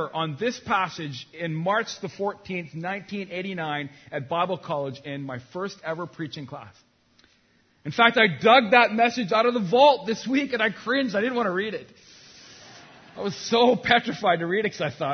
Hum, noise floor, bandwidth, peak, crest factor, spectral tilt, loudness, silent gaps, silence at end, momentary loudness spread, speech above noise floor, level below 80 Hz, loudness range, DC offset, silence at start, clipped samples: none; -63 dBFS; 6.6 kHz; -2 dBFS; 24 dB; -5 dB/octave; -24 LUFS; none; 0 s; 16 LU; 39 dB; -66 dBFS; 12 LU; under 0.1%; 0 s; under 0.1%